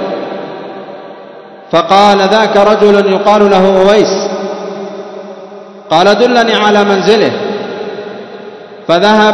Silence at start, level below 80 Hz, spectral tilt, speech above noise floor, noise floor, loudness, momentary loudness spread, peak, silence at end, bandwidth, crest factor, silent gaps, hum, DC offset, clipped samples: 0 s; -48 dBFS; -5 dB/octave; 24 dB; -31 dBFS; -9 LUFS; 21 LU; 0 dBFS; 0 s; 11 kHz; 10 dB; none; none; under 0.1%; 2%